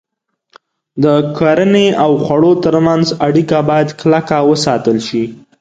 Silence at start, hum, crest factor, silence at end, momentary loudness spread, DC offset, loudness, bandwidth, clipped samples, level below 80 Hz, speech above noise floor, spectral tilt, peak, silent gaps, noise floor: 0.95 s; none; 12 dB; 0.25 s; 5 LU; under 0.1%; -12 LUFS; 9.2 kHz; under 0.1%; -48 dBFS; 48 dB; -6.5 dB/octave; 0 dBFS; none; -59 dBFS